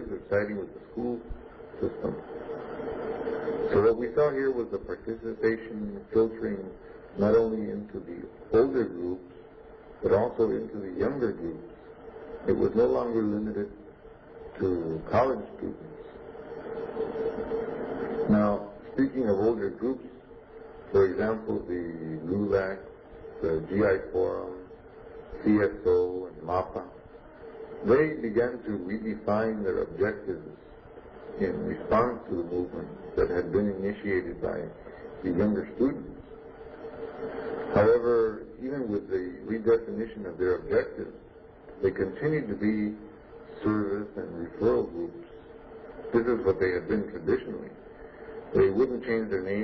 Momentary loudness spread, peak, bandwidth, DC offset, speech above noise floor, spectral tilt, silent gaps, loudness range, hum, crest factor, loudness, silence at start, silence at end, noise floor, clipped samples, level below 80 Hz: 21 LU; -10 dBFS; 5.4 kHz; under 0.1%; 21 dB; -10 dB/octave; none; 4 LU; none; 20 dB; -29 LUFS; 0 s; 0 s; -49 dBFS; under 0.1%; -52 dBFS